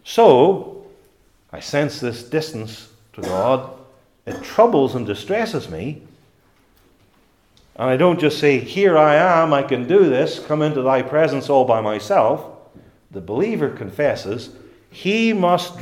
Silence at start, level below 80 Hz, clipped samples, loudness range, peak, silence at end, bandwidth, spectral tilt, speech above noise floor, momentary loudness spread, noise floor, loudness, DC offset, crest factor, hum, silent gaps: 0.05 s; -58 dBFS; under 0.1%; 9 LU; 0 dBFS; 0 s; 15.5 kHz; -6 dB/octave; 40 dB; 18 LU; -57 dBFS; -18 LUFS; under 0.1%; 18 dB; none; none